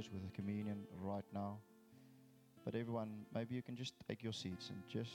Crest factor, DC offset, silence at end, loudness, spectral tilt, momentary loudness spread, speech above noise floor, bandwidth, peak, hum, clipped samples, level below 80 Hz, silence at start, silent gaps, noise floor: 18 dB; under 0.1%; 0 s; -47 LUFS; -6.5 dB/octave; 21 LU; 20 dB; 17 kHz; -30 dBFS; none; under 0.1%; -80 dBFS; 0 s; none; -67 dBFS